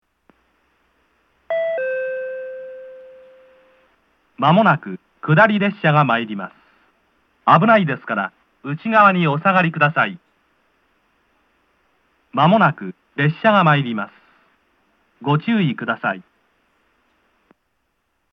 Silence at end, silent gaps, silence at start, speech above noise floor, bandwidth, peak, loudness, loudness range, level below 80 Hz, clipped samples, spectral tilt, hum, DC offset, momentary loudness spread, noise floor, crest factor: 2.1 s; none; 1.5 s; 54 dB; 6 kHz; 0 dBFS; -17 LUFS; 8 LU; -74 dBFS; under 0.1%; -8.5 dB/octave; none; under 0.1%; 18 LU; -70 dBFS; 20 dB